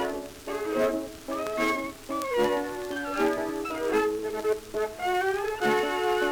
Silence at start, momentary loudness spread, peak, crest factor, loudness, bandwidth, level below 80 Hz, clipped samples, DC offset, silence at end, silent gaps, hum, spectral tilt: 0 s; 7 LU; -12 dBFS; 16 dB; -28 LUFS; over 20 kHz; -54 dBFS; under 0.1%; under 0.1%; 0 s; none; none; -4 dB/octave